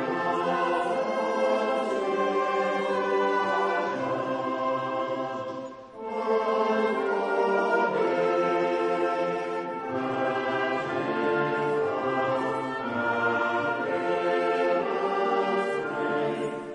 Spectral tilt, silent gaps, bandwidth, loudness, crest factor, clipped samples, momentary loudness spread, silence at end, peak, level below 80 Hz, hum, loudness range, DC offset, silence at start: -5.5 dB/octave; none; 10.5 kHz; -27 LUFS; 14 dB; under 0.1%; 5 LU; 0 s; -12 dBFS; -72 dBFS; none; 3 LU; under 0.1%; 0 s